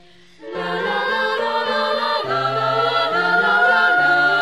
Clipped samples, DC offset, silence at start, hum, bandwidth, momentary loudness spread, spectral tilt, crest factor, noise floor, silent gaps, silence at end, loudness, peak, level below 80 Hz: under 0.1%; 0.3%; 0.4 s; none; 13.5 kHz; 8 LU; -4 dB/octave; 14 dB; -40 dBFS; none; 0 s; -17 LUFS; -4 dBFS; -64 dBFS